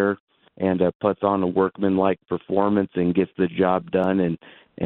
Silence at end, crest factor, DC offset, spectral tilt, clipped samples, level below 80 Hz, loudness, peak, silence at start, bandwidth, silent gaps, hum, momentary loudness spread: 0 s; 18 dB; under 0.1%; -10.5 dB/octave; under 0.1%; -58 dBFS; -22 LUFS; -4 dBFS; 0 s; 4.2 kHz; 0.20-0.27 s, 0.95-1.00 s; none; 5 LU